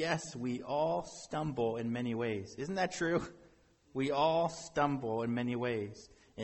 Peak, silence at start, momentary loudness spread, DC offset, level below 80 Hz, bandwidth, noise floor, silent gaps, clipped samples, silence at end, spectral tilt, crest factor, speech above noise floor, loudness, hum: -18 dBFS; 0 s; 9 LU; under 0.1%; -64 dBFS; 8.4 kHz; -65 dBFS; none; under 0.1%; 0 s; -5.5 dB/octave; 18 dB; 30 dB; -35 LUFS; none